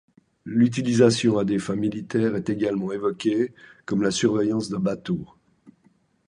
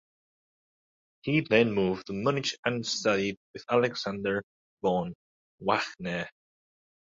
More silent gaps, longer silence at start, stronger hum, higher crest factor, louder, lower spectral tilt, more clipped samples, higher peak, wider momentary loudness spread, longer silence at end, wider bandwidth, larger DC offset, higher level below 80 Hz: second, none vs 2.59-2.63 s, 3.37-3.54 s, 4.43-4.77 s, 5.15-5.58 s; second, 0.45 s vs 1.25 s; neither; about the same, 20 dB vs 22 dB; first, -23 LUFS vs -29 LUFS; about the same, -6 dB/octave vs -5 dB/octave; neither; first, -4 dBFS vs -8 dBFS; about the same, 10 LU vs 11 LU; about the same, 0.6 s vs 0.7 s; first, 11 kHz vs 7.8 kHz; neither; first, -58 dBFS vs -64 dBFS